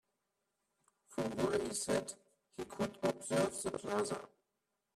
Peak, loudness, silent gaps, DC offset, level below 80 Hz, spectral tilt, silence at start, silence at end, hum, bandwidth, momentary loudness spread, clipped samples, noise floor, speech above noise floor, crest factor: -22 dBFS; -38 LUFS; none; under 0.1%; -70 dBFS; -4 dB/octave; 1.1 s; 0.7 s; none; 14.5 kHz; 13 LU; under 0.1%; -86 dBFS; 49 dB; 18 dB